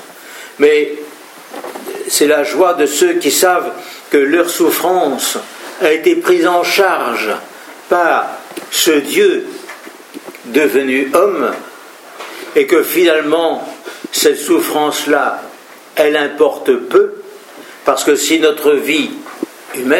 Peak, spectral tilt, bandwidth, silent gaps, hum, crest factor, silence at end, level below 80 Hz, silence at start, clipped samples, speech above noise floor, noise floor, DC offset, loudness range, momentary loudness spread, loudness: 0 dBFS; -2 dB/octave; 17 kHz; none; none; 14 dB; 0 s; -68 dBFS; 0 s; under 0.1%; 24 dB; -36 dBFS; under 0.1%; 2 LU; 19 LU; -13 LUFS